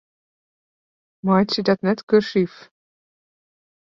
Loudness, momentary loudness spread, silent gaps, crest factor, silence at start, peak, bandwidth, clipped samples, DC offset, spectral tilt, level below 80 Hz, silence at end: -20 LUFS; 7 LU; 2.03-2.07 s; 20 dB; 1.25 s; -4 dBFS; 7.2 kHz; under 0.1%; under 0.1%; -7 dB/octave; -64 dBFS; 1.5 s